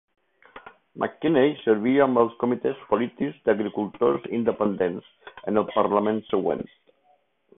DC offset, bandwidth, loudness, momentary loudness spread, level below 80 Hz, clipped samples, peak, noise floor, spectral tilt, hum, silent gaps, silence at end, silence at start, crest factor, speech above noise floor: under 0.1%; 3.9 kHz; -24 LUFS; 9 LU; -62 dBFS; under 0.1%; -6 dBFS; -65 dBFS; -11 dB/octave; none; none; 0.95 s; 0.55 s; 20 dB; 41 dB